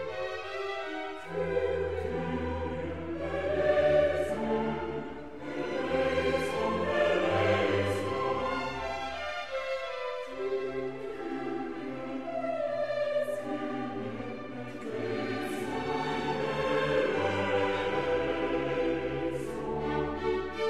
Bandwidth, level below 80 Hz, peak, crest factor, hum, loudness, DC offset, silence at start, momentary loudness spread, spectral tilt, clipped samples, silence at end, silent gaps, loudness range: 14 kHz; -52 dBFS; -14 dBFS; 18 dB; none; -31 LUFS; 0.4%; 0 s; 10 LU; -6 dB/octave; under 0.1%; 0 s; none; 5 LU